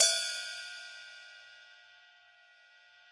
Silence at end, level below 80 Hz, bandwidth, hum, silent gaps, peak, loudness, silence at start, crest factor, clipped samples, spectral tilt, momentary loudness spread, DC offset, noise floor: 1.35 s; under -90 dBFS; 11.5 kHz; none; none; -10 dBFS; -34 LUFS; 0 s; 26 dB; under 0.1%; 5.5 dB/octave; 25 LU; under 0.1%; -62 dBFS